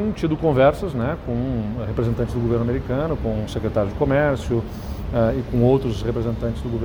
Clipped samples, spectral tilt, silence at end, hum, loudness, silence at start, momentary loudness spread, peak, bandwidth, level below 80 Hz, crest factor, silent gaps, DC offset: under 0.1%; -8 dB/octave; 0 s; none; -22 LUFS; 0 s; 7 LU; -4 dBFS; over 20 kHz; -34 dBFS; 18 dB; none; under 0.1%